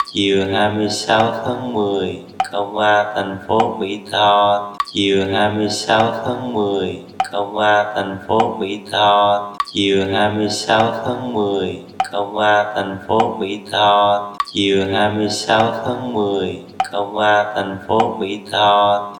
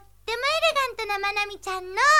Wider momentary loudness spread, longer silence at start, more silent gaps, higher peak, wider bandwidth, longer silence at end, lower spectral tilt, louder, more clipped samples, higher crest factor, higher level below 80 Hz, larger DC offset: about the same, 9 LU vs 9 LU; second, 0 s vs 0.25 s; neither; first, 0 dBFS vs -8 dBFS; about the same, 18 kHz vs 17 kHz; about the same, 0 s vs 0 s; first, -4.5 dB/octave vs 0 dB/octave; first, -17 LUFS vs -25 LUFS; neither; about the same, 16 dB vs 16 dB; about the same, -56 dBFS vs -56 dBFS; second, under 0.1% vs 0.2%